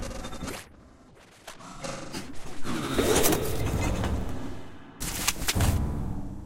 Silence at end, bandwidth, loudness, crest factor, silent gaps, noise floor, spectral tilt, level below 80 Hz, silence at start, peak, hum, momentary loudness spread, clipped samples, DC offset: 0 s; 17 kHz; -29 LUFS; 22 dB; none; -53 dBFS; -4 dB/octave; -36 dBFS; 0 s; -6 dBFS; none; 20 LU; under 0.1%; under 0.1%